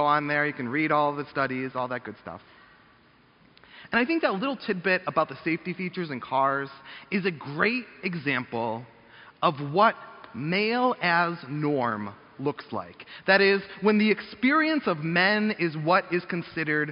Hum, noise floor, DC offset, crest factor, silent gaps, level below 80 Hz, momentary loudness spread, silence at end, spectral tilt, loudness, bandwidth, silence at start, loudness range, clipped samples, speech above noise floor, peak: none; -59 dBFS; under 0.1%; 20 dB; none; -68 dBFS; 13 LU; 0 s; -3.5 dB/octave; -26 LUFS; 5.6 kHz; 0 s; 7 LU; under 0.1%; 33 dB; -6 dBFS